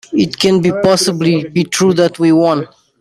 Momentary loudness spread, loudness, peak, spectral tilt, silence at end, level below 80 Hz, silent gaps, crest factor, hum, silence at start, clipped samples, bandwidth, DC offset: 5 LU; -13 LUFS; 0 dBFS; -5 dB/octave; 0.35 s; -52 dBFS; none; 12 dB; none; 0.1 s; under 0.1%; 15.5 kHz; under 0.1%